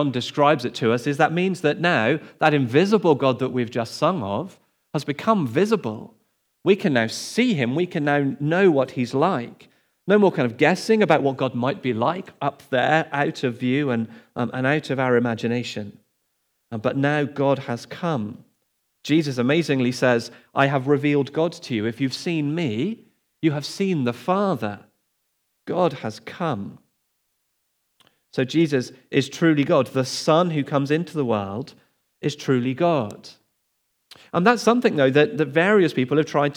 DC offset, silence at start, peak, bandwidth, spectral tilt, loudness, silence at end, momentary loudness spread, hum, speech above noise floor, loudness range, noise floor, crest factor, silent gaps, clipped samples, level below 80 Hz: under 0.1%; 0 s; -2 dBFS; 17 kHz; -6 dB/octave; -22 LUFS; 0 s; 11 LU; none; 51 dB; 6 LU; -72 dBFS; 20 dB; none; under 0.1%; -76 dBFS